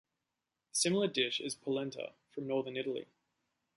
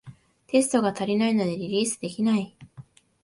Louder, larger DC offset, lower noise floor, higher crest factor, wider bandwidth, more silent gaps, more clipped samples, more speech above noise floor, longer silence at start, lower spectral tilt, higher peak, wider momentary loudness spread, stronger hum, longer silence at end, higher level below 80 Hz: second, -35 LUFS vs -25 LUFS; neither; first, -88 dBFS vs -49 dBFS; about the same, 20 dB vs 18 dB; about the same, 11.5 kHz vs 11.5 kHz; neither; neither; first, 53 dB vs 25 dB; first, 0.75 s vs 0.05 s; second, -3 dB/octave vs -4.5 dB/octave; second, -18 dBFS vs -8 dBFS; first, 13 LU vs 5 LU; neither; first, 0.7 s vs 0.4 s; second, -82 dBFS vs -66 dBFS